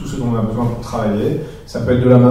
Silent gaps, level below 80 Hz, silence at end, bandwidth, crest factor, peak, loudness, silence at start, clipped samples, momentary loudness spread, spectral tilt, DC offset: none; -34 dBFS; 0 s; 12 kHz; 14 dB; 0 dBFS; -17 LUFS; 0 s; under 0.1%; 12 LU; -8.5 dB/octave; under 0.1%